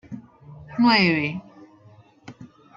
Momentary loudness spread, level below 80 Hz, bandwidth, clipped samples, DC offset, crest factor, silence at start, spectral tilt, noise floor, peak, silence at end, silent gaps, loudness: 24 LU; -60 dBFS; 7.6 kHz; under 0.1%; under 0.1%; 20 dB; 0.1 s; -6.5 dB/octave; -52 dBFS; -6 dBFS; 0.3 s; none; -19 LUFS